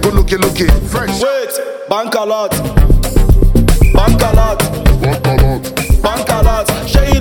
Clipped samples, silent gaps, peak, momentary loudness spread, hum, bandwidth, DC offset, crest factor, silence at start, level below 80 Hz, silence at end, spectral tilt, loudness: under 0.1%; none; 0 dBFS; 5 LU; none; 18.5 kHz; under 0.1%; 10 dB; 0 s; -12 dBFS; 0 s; -5.5 dB/octave; -13 LUFS